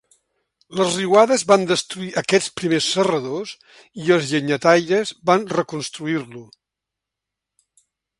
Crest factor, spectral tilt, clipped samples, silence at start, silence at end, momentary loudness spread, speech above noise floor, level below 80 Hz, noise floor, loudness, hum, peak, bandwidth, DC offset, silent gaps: 20 dB; -4 dB/octave; under 0.1%; 0.7 s; 1.75 s; 12 LU; 65 dB; -64 dBFS; -84 dBFS; -19 LUFS; none; 0 dBFS; 11.5 kHz; under 0.1%; none